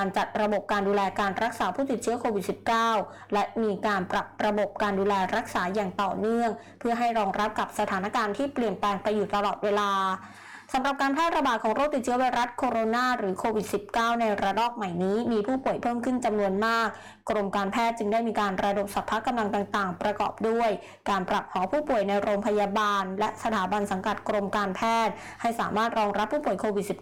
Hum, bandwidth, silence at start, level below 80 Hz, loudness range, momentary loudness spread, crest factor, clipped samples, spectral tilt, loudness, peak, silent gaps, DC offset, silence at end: none; 18.5 kHz; 0 s; -56 dBFS; 1 LU; 4 LU; 6 dB; under 0.1%; -5 dB/octave; -27 LUFS; -20 dBFS; none; under 0.1%; 0 s